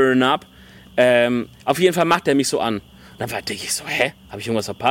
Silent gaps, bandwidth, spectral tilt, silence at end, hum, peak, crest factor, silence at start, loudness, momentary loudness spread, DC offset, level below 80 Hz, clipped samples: none; 17 kHz; -4 dB/octave; 0 s; none; -2 dBFS; 18 dB; 0 s; -20 LUFS; 11 LU; under 0.1%; -54 dBFS; under 0.1%